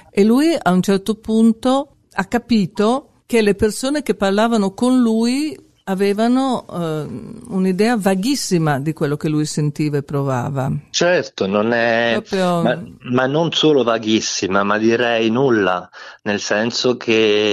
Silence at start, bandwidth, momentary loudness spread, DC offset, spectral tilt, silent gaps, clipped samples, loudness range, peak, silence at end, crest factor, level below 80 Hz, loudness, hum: 0.15 s; 14 kHz; 8 LU; under 0.1%; -5 dB/octave; none; under 0.1%; 2 LU; -2 dBFS; 0 s; 14 dB; -50 dBFS; -17 LUFS; none